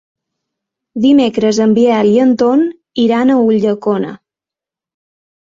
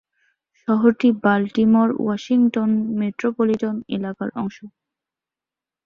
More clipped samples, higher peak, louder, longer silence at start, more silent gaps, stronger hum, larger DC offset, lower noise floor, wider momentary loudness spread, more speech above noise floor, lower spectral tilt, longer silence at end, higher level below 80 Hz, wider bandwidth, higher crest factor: neither; about the same, -2 dBFS vs -4 dBFS; first, -12 LUFS vs -20 LUFS; first, 0.95 s vs 0.7 s; neither; neither; neither; about the same, -87 dBFS vs -89 dBFS; second, 8 LU vs 11 LU; first, 76 dB vs 70 dB; second, -6 dB/octave vs -7.5 dB/octave; first, 1.35 s vs 1.2 s; first, -56 dBFS vs -62 dBFS; first, 7.6 kHz vs 6.8 kHz; about the same, 12 dB vs 16 dB